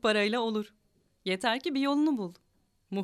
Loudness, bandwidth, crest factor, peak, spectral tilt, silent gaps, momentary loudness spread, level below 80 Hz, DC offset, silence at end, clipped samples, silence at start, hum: -30 LUFS; 13 kHz; 18 dB; -14 dBFS; -5 dB/octave; none; 12 LU; -72 dBFS; under 0.1%; 0 s; under 0.1%; 0.05 s; none